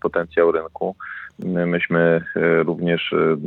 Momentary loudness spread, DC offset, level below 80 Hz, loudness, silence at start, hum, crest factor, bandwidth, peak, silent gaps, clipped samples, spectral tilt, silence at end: 10 LU; under 0.1%; -60 dBFS; -20 LUFS; 0.05 s; none; 16 dB; 4.2 kHz; -4 dBFS; none; under 0.1%; -9.5 dB/octave; 0 s